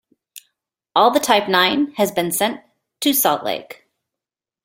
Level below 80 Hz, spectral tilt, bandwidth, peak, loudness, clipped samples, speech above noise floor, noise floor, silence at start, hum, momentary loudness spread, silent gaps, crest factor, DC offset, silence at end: -64 dBFS; -2.5 dB/octave; 17 kHz; -2 dBFS; -18 LUFS; under 0.1%; 70 dB; -87 dBFS; 0.35 s; none; 9 LU; none; 18 dB; under 0.1%; 0.9 s